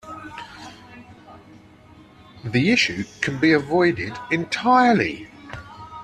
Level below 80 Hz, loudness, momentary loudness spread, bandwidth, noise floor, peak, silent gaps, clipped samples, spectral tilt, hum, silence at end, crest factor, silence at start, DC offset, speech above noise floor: -56 dBFS; -20 LUFS; 22 LU; 10 kHz; -48 dBFS; -4 dBFS; none; under 0.1%; -5 dB/octave; none; 0 s; 20 dB; 0.05 s; under 0.1%; 28 dB